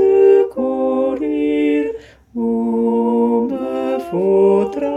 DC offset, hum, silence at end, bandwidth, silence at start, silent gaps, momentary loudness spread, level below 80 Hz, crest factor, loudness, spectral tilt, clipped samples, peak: under 0.1%; none; 0 s; 8.2 kHz; 0 s; none; 9 LU; -52 dBFS; 14 dB; -16 LUFS; -8 dB/octave; under 0.1%; -2 dBFS